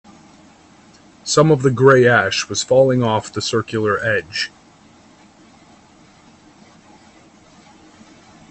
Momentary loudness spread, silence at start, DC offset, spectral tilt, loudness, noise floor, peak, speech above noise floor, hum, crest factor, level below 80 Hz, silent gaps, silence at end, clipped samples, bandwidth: 11 LU; 1.25 s; under 0.1%; -4.5 dB/octave; -16 LUFS; -48 dBFS; 0 dBFS; 33 dB; none; 20 dB; -56 dBFS; none; 4.05 s; under 0.1%; 8.6 kHz